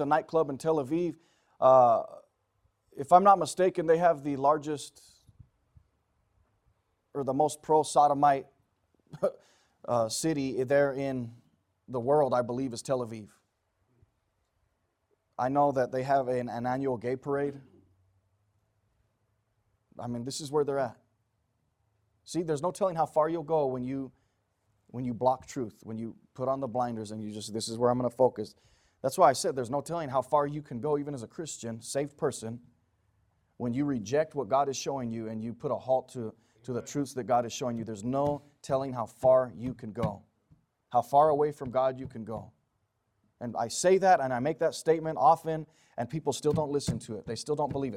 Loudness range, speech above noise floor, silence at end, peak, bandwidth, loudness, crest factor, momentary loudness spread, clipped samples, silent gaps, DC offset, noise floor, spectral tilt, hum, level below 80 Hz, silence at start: 9 LU; 49 dB; 0 s; -6 dBFS; 16 kHz; -29 LUFS; 24 dB; 15 LU; under 0.1%; none; under 0.1%; -77 dBFS; -5.5 dB/octave; none; -66 dBFS; 0 s